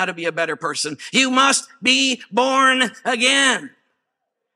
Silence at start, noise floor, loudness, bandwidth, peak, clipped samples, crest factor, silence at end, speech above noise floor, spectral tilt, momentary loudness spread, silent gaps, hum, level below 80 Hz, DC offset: 0 s; -78 dBFS; -17 LUFS; 14.5 kHz; -2 dBFS; under 0.1%; 18 dB; 0.85 s; 59 dB; -1 dB/octave; 9 LU; none; none; -76 dBFS; under 0.1%